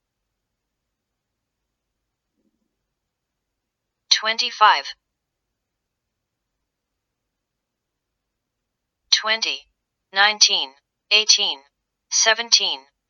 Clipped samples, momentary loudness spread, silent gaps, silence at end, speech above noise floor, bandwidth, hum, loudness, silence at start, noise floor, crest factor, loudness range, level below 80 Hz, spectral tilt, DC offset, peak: under 0.1%; 11 LU; none; 0.3 s; 62 dB; 7.8 kHz; none; -17 LUFS; 4.1 s; -81 dBFS; 24 dB; 8 LU; -80 dBFS; 3 dB/octave; under 0.1%; 0 dBFS